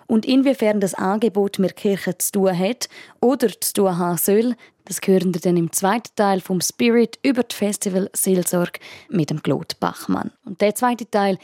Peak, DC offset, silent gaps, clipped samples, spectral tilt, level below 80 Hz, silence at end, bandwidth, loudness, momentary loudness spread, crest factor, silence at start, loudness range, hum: -4 dBFS; under 0.1%; none; under 0.1%; -5 dB/octave; -68 dBFS; 0.05 s; 17 kHz; -20 LUFS; 7 LU; 16 dB; 0.1 s; 2 LU; none